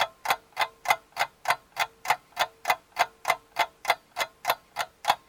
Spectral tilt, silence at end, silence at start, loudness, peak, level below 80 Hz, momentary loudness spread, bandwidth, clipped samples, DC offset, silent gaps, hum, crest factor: 0 dB/octave; 0.1 s; 0 s; -29 LUFS; -6 dBFS; -68 dBFS; 4 LU; over 20 kHz; under 0.1%; under 0.1%; none; none; 24 dB